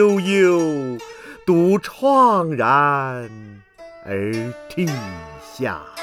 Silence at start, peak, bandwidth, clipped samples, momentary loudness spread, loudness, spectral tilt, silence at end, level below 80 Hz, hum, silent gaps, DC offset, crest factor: 0 s; -4 dBFS; 15.5 kHz; under 0.1%; 18 LU; -19 LUFS; -6.5 dB/octave; 0 s; -56 dBFS; none; none; under 0.1%; 16 dB